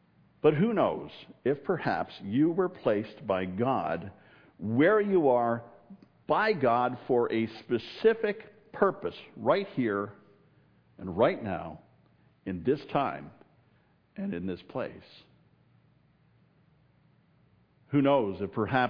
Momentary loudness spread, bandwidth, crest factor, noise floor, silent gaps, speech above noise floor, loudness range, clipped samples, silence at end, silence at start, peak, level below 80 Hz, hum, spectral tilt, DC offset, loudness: 15 LU; 5.4 kHz; 22 dB; -66 dBFS; none; 38 dB; 14 LU; under 0.1%; 0 s; 0.45 s; -10 dBFS; -68 dBFS; none; -9 dB/octave; under 0.1%; -29 LUFS